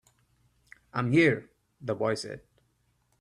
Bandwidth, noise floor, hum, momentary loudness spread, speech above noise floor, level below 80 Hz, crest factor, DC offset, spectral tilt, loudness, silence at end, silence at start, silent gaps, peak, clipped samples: 11 kHz; -71 dBFS; none; 18 LU; 45 dB; -66 dBFS; 20 dB; under 0.1%; -6.5 dB/octave; -28 LUFS; 0.8 s; 0.95 s; none; -10 dBFS; under 0.1%